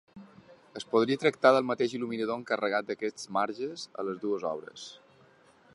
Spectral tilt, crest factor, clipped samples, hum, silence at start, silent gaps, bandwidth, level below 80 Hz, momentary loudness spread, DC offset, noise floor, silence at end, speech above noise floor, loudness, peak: -5 dB/octave; 24 dB; under 0.1%; none; 0.15 s; none; 11.5 kHz; -78 dBFS; 18 LU; under 0.1%; -60 dBFS; 0.8 s; 31 dB; -29 LUFS; -8 dBFS